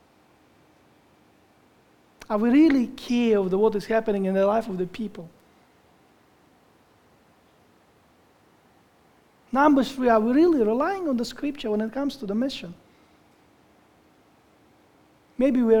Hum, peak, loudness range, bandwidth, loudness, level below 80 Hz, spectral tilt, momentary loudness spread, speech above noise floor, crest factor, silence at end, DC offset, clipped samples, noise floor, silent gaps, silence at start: none; -6 dBFS; 12 LU; 16.5 kHz; -23 LUFS; -56 dBFS; -6.5 dB/octave; 12 LU; 37 dB; 20 dB; 0 s; under 0.1%; under 0.1%; -59 dBFS; none; 2.3 s